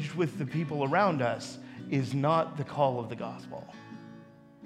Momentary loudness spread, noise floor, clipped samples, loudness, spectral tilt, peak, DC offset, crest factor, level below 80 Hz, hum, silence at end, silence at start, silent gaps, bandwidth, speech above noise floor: 20 LU; -52 dBFS; under 0.1%; -30 LUFS; -7 dB/octave; -12 dBFS; under 0.1%; 20 dB; -72 dBFS; none; 0 s; 0 s; none; 12 kHz; 22 dB